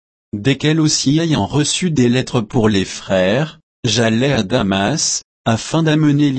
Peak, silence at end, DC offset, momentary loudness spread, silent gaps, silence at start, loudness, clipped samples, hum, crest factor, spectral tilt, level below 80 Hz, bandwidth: -2 dBFS; 0 s; under 0.1%; 6 LU; 3.63-3.83 s, 5.24-5.45 s; 0.35 s; -16 LUFS; under 0.1%; none; 14 dB; -4.5 dB/octave; -42 dBFS; 8.8 kHz